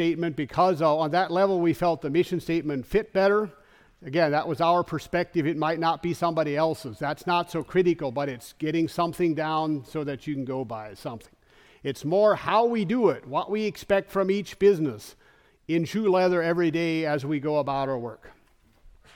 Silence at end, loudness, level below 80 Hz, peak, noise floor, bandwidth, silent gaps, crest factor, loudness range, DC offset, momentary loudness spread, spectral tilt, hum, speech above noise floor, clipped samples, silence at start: 0.25 s; -25 LUFS; -56 dBFS; -8 dBFS; -60 dBFS; 17.5 kHz; none; 16 dB; 4 LU; under 0.1%; 10 LU; -6.5 dB/octave; none; 35 dB; under 0.1%; 0 s